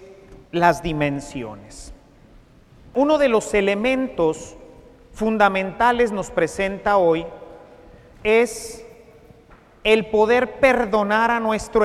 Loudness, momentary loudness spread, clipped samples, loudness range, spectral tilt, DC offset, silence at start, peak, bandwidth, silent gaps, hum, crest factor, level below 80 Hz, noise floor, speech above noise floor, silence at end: -19 LUFS; 16 LU; under 0.1%; 3 LU; -5 dB/octave; under 0.1%; 0 s; -2 dBFS; 14.5 kHz; none; none; 20 dB; -44 dBFS; -49 dBFS; 30 dB; 0 s